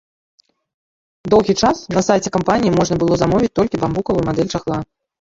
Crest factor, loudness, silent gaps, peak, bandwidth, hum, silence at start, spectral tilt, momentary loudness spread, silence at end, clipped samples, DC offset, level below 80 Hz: 16 dB; -17 LUFS; none; -2 dBFS; 7.8 kHz; none; 1.25 s; -6 dB/octave; 7 LU; 0.4 s; under 0.1%; under 0.1%; -42 dBFS